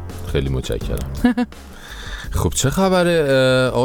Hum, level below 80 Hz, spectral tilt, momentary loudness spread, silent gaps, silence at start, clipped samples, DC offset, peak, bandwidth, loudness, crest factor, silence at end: none; -30 dBFS; -5 dB/octave; 16 LU; none; 0 s; under 0.1%; under 0.1%; -2 dBFS; 19.5 kHz; -19 LUFS; 18 dB; 0 s